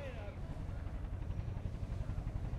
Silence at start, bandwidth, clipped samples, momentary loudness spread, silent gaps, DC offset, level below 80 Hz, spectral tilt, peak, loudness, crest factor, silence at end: 0 s; 10.5 kHz; under 0.1%; 3 LU; none; under 0.1%; -44 dBFS; -8 dB/octave; -28 dBFS; -44 LUFS; 14 dB; 0 s